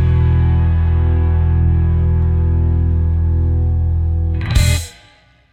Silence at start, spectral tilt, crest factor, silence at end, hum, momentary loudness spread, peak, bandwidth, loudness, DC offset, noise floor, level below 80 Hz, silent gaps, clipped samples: 0 s; -6.5 dB/octave; 12 dB; 0.6 s; none; 3 LU; -2 dBFS; 11.5 kHz; -16 LUFS; under 0.1%; -49 dBFS; -20 dBFS; none; under 0.1%